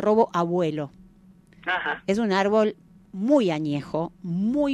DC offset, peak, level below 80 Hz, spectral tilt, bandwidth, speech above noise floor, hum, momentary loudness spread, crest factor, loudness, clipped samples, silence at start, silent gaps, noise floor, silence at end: under 0.1%; -6 dBFS; -60 dBFS; -6.5 dB/octave; 10.5 kHz; 30 dB; none; 10 LU; 18 dB; -24 LUFS; under 0.1%; 0 s; none; -53 dBFS; 0 s